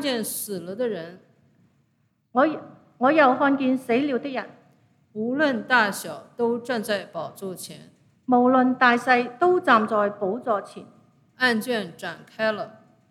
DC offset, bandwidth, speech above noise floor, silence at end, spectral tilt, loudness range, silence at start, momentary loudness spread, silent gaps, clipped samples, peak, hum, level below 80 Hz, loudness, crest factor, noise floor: under 0.1%; 16 kHz; 45 dB; 0.4 s; -4 dB/octave; 5 LU; 0 s; 17 LU; none; under 0.1%; -4 dBFS; none; -78 dBFS; -23 LUFS; 20 dB; -68 dBFS